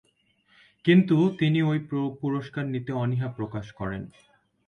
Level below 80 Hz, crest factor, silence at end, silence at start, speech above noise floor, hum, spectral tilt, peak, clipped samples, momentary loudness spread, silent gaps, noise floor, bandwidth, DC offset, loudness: -58 dBFS; 20 dB; 0.6 s; 0.85 s; 41 dB; none; -8.5 dB/octave; -8 dBFS; under 0.1%; 14 LU; none; -66 dBFS; 6.8 kHz; under 0.1%; -26 LUFS